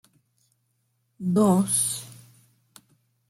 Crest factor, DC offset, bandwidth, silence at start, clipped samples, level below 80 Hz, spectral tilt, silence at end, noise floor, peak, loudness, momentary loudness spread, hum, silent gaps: 20 dB; under 0.1%; 16 kHz; 1.2 s; under 0.1%; -68 dBFS; -5.5 dB/octave; 1.15 s; -72 dBFS; -8 dBFS; -23 LUFS; 14 LU; none; none